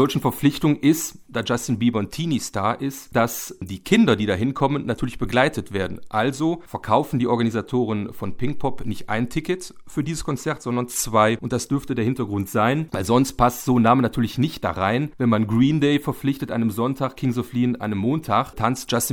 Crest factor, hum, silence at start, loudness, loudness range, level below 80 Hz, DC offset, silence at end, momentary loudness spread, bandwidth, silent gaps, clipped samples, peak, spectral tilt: 20 dB; none; 0 s; -22 LUFS; 4 LU; -44 dBFS; under 0.1%; 0 s; 9 LU; 20 kHz; none; under 0.1%; -2 dBFS; -5.5 dB/octave